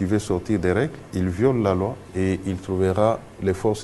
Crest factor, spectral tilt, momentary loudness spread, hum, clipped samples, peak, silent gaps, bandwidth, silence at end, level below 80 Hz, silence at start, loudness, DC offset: 18 dB; -7 dB/octave; 7 LU; none; under 0.1%; -4 dBFS; none; 12.5 kHz; 0 s; -46 dBFS; 0 s; -23 LUFS; under 0.1%